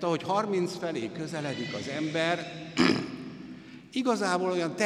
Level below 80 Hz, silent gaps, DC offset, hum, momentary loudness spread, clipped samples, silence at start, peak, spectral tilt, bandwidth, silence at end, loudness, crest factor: -68 dBFS; none; under 0.1%; none; 14 LU; under 0.1%; 0 s; -10 dBFS; -5 dB/octave; 13 kHz; 0 s; -30 LUFS; 20 dB